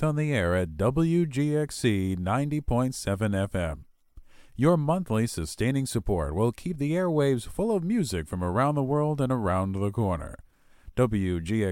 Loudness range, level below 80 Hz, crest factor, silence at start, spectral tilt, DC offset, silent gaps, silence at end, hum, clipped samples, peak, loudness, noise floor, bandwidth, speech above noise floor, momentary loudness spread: 2 LU; -44 dBFS; 18 dB; 0 s; -7 dB/octave; under 0.1%; none; 0 s; none; under 0.1%; -8 dBFS; -27 LUFS; -51 dBFS; 17 kHz; 25 dB; 6 LU